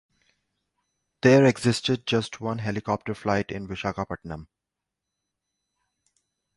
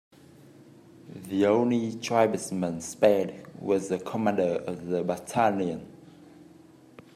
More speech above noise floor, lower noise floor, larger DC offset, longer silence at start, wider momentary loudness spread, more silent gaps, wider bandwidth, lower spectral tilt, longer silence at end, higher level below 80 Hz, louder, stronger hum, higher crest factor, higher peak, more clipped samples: first, 62 dB vs 27 dB; first, -86 dBFS vs -53 dBFS; neither; first, 1.25 s vs 1.05 s; first, 15 LU vs 10 LU; neither; second, 11.5 kHz vs 15 kHz; about the same, -6 dB/octave vs -5.5 dB/octave; first, 2.15 s vs 0.75 s; first, -54 dBFS vs -70 dBFS; first, -24 LUFS vs -27 LUFS; first, 50 Hz at -50 dBFS vs none; about the same, 22 dB vs 22 dB; about the same, -6 dBFS vs -6 dBFS; neither